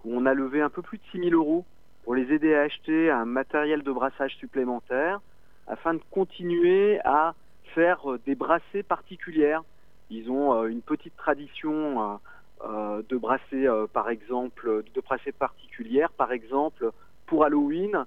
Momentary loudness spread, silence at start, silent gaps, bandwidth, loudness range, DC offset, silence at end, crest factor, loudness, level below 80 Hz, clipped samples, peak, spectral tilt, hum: 10 LU; 0.05 s; none; 4.1 kHz; 4 LU; 0.4%; 0 s; 20 dB; -26 LUFS; -60 dBFS; under 0.1%; -6 dBFS; -8 dB/octave; none